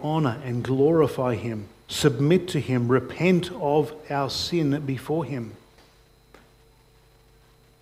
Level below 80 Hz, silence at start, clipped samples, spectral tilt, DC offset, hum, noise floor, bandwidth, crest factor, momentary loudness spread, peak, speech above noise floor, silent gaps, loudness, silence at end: -56 dBFS; 0 s; under 0.1%; -6.5 dB/octave; under 0.1%; none; -57 dBFS; 16 kHz; 20 dB; 11 LU; -6 dBFS; 33 dB; none; -24 LUFS; 2.25 s